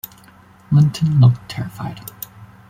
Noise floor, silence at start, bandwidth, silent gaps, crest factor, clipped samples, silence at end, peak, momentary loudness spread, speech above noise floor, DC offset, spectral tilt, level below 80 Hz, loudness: -47 dBFS; 0.7 s; 16 kHz; none; 16 dB; under 0.1%; 0.25 s; -2 dBFS; 21 LU; 31 dB; under 0.1%; -7.5 dB/octave; -48 dBFS; -16 LUFS